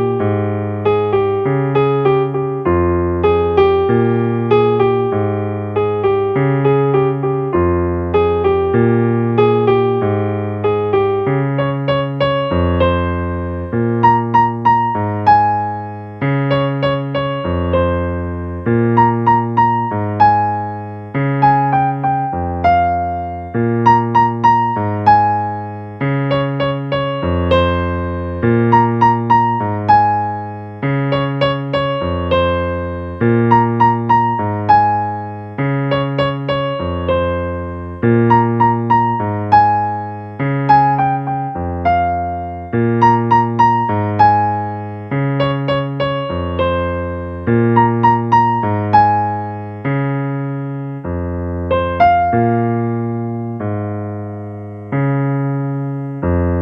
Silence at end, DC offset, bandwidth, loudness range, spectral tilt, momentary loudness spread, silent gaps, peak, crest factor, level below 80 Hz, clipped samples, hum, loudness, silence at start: 0 s; under 0.1%; 6.2 kHz; 3 LU; -9 dB/octave; 10 LU; none; 0 dBFS; 14 dB; -38 dBFS; under 0.1%; none; -15 LUFS; 0 s